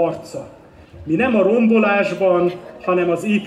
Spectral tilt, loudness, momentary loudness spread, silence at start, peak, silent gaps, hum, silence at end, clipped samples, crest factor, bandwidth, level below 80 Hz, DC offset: -7 dB/octave; -17 LUFS; 17 LU; 0 s; -4 dBFS; none; none; 0 s; under 0.1%; 14 dB; 11.5 kHz; -56 dBFS; under 0.1%